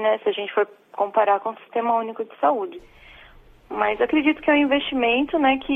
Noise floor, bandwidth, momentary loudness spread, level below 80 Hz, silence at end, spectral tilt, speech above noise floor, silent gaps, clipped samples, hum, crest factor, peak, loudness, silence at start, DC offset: -49 dBFS; 3.9 kHz; 9 LU; -54 dBFS; 0 s; -6 dB/octave; 27 dB; none; under 0.1%; none; 16 dB; -6 dBFS; -22 LUFS; 0 s; under 0.1%